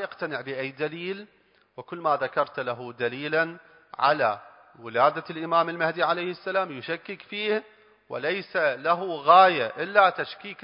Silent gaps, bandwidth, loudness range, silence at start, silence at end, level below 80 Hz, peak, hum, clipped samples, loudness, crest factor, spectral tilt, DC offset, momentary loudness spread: none; 5.4 kHz; 7 LU; 0 s; 0.1 s; -78 dBFS; -4 dBFS; none; under 0.1%; -25 LUFS; 22 dB; -8.5 dB/octave; under 0.1%; 14 LU